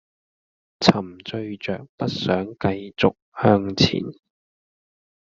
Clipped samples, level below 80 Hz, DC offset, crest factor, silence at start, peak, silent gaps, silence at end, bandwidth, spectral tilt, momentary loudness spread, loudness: under 0.1%; -56 dBFS; under 0.1%; 22 dB; 0.8 s; -2 dBFS; 1.89-1.98 s, 3.22-3.32 s; 1.1 s; 7.6 kHz; -6 dB/octave; 12 LU; -22 LUFS